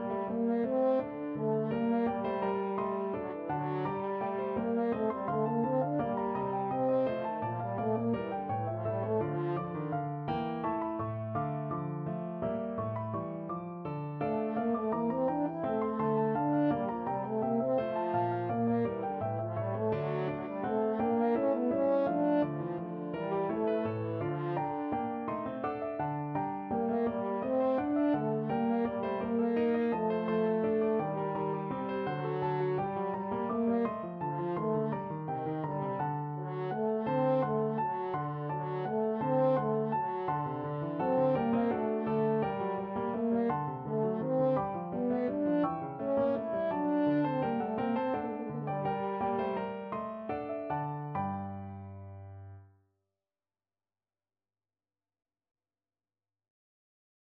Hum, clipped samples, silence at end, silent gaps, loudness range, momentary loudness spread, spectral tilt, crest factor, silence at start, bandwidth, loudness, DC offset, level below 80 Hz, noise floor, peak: none; under 0.1%; 4.65 s; none; 4 LU; 7 LU; -7.5 dB/octave; 14 dB; 0 s; 5.2 kHz; -33 LUFS; under 0.1%; -66 dBFS; under -90 dBFS; -18 dBFS